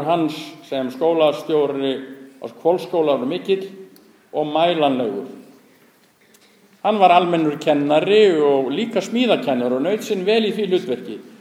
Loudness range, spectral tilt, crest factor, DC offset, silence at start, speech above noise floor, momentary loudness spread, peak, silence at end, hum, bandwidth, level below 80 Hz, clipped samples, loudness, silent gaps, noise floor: 6 LU; -5.5 dB/octave; 20 dB; under 0.1%; 0 s; 36 dB; 14 LU; 0 dBFS; 0.1 s; none; 15 kHz; -74 dBFS; under 0.1%; -19 LUFS; none; -55 dBFS